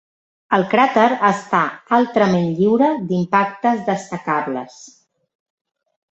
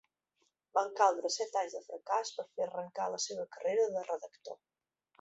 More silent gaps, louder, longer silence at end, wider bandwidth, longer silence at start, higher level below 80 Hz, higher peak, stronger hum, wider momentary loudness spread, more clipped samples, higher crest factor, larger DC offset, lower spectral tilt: neither; first, -17 LUFS vs -35 LUFS; first, 1.25 s vs 0.65 s; about the same, 8.2 kHz vs 8 kHz; second, 0.5 s vs 0.75 s; first, -62 dBFS vs -88 dBFS; first, 0 dBFS vs -14 dBFS; neither; second, 8 LU vs 15 LU; neither; about the same, 18 dB vs 22 dB; neither; first, -6.5 dB/octave vs -1 dB/octave